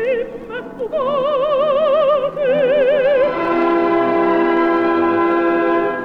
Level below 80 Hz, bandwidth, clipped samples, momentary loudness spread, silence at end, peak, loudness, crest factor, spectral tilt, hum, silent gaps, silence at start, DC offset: -48 dBFS; 5.6 kHz; under 0.1%; 7 LU; 0 s; -4 dBFS; -16 LUFS; 10 dB; -7 dB/octave; none; none; 0 s; under 0.1%